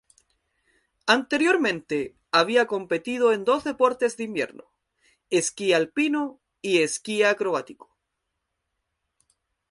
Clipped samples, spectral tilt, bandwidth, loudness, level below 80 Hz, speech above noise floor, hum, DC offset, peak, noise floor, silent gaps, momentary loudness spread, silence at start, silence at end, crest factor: under 0.1%; -3 dB/octave; 11.5 kHz; -24 LUFS; -70 dBFS; 57 dB; none; under 0.1%; -4 dBFS; -80 dBFS; none; 9 LU; 1.05 s; 1.95 s; 20 dB